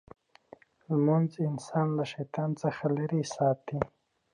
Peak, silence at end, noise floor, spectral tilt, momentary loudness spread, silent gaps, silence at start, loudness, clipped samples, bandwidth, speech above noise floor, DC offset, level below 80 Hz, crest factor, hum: -10 dBFS; 0.5 s; -56 dBFS; -7.5 dB/octave; 8 LU; none; 0.9 s; -30 LUFS; under 0.1%; 10.5 kHz; 27 dB; under 0.1%; -66 dBFS; 20 dB; none